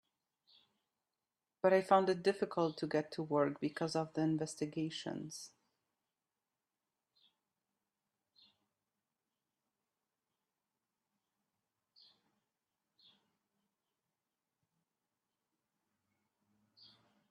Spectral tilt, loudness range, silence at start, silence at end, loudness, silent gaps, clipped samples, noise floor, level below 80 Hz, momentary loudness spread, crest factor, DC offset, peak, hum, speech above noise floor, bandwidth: -5.5 dB/octave; 13 LU; 1.65 s; 11.85 s; -36 LUFS; none; under 0.1%; under -90 dBFS; -86 dBFS; 14 LU; 26 dB; under 0.1%; -16 dBFS; none; over 55 dB; 13 kHz